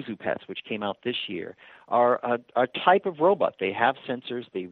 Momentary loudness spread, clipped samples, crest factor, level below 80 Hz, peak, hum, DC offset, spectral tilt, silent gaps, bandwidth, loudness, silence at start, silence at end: 12 LU; under 0.1%; 22 dB; -74 dBFS; -4 dBFS; none; under 0.1%; -7.5 dB/octave; none; 4.5 kHz; -26 LUFS; 0 s; 0 s